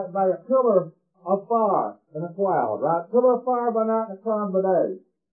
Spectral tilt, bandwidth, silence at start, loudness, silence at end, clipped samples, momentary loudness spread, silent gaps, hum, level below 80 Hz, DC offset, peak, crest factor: -14 dB/octave; 2.7 kHz; 0 s; -23 LUFS; 0.35 s; under 0.1%; 12 LU; none; none; under -90 dBFS; under 0.1%; -6 dBFS; 16 dB